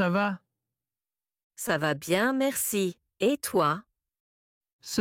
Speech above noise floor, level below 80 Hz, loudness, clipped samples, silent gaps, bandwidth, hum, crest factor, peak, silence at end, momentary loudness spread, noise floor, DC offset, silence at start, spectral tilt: over 63 dB; -70 dBFS; -28 LUFS; under 0.1%; 1.44-1.50 s, 4.20-4.61 s, 4.73-4.79 s; 16.5 kHz; none; 18 dB; -12 dBFS; 0 s; 10 LU; under -90 dBFS; under 0.1%; 0 s; -4 dB/octave